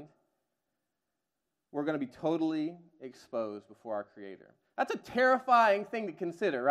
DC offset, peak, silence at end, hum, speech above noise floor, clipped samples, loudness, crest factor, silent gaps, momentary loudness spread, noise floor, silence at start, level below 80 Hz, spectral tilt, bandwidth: under 0.1%; -12 dBFS; 0 s; none; 55 dB; under 0.1%; -31 LUFS; 20 dB; none; 22 LU; -87 dBFS; 0 s; -78 dBFS; -5.5 dB/octave; 13.5 kHz